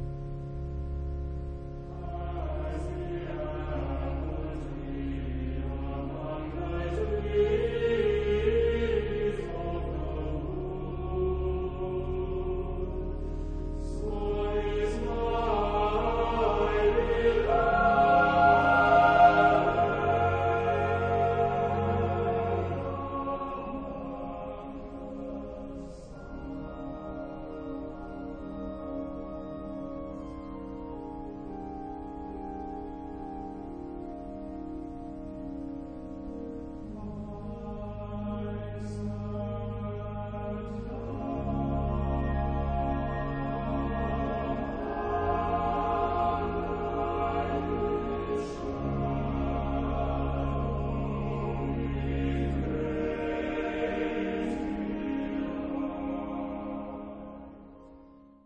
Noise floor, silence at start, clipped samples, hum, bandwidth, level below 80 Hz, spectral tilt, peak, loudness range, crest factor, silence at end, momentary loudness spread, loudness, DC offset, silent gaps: -54 dBFS; 0 s; under 0.1%; none; 9 kHz; -38 dBFS; -8 dB/octave; -8 dBFS; 16 LU; 22 dB; 0.3 s; 14 LU; -31 LUFS; under 0.1%; none